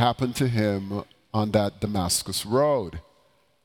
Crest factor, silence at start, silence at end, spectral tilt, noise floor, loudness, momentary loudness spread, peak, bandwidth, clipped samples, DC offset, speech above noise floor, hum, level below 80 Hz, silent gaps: 18 dB; 0 s; 0.65 s; -5 dB/octave; -64 dBFS; -25 LUFS; 11 LU; -8 dBFS; 19 kHz; under 0.1%; under 0.1%; 39 dB; none; -50 dBFS; none